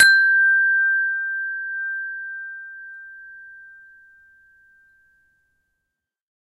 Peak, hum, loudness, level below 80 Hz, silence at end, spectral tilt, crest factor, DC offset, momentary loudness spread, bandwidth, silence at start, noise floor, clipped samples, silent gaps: -2 dBFS; none; -18 LUFS; -72 dBFS; 2.85 s; 3 dB/octave; 20 dB; under 0.1%; 25 LU; 14 kHz; 0 s; -81 dBFS; under 0.1%; none